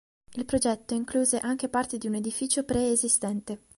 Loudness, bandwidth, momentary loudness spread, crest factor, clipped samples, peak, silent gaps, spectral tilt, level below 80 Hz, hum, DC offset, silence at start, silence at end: -27 LUFS; 11.5 kHz; 8 LU; 20 dB; under 0.1%; -8 dBFS; none; -3.5 dB/octave; -54 dBFS; none; under 0.1%; 0.3 s; 0.2 s